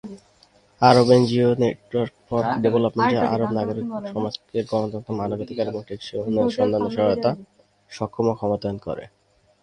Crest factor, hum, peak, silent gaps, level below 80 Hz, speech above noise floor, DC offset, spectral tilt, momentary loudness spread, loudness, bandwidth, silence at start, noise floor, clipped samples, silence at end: 22 dB; none; 0 dBFS; none; -54 dBFS; 36 dB; under 0.1%; -7 dB/octave; 15 LU; -22 LUFS; 10.5 kHz; 0.05 s; -57 dBFS; under 0.1%; 0.55 s